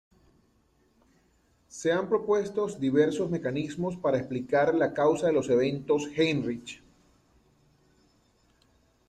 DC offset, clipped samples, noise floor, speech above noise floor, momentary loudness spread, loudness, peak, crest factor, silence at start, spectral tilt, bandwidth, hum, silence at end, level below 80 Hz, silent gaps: under 0.1%; under 0.1%; -67 dBFS; 40 dB; 8 LU; -27 LUFS; -10 dBFS; 18 dB; 1.75 s; -6 dB/octave; 10 kHz; none; 2.35 s; -64 dBFS; none